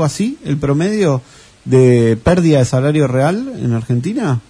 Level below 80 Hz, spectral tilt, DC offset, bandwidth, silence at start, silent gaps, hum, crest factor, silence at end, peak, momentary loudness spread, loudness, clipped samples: -38 dBFS; -7 dB/octave; under 0.1%; 11 kHz; 0 s; none; none; 14 dB; 0.1 s; 0 dBFS; 8 LU; -14 LUFS; under 0.1%